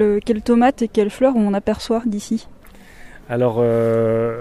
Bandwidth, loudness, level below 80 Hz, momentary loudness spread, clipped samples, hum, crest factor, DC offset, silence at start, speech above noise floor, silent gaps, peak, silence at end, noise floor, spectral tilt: 12.5 kHz; -18 LUFS; -44 dBFS; 8 LU; under 0.1%; none; 16 dB; under 0.1%; 0 s; 24 dB; none; -2 dBFS; 0 s; -41 dBFS; -7 dB/octave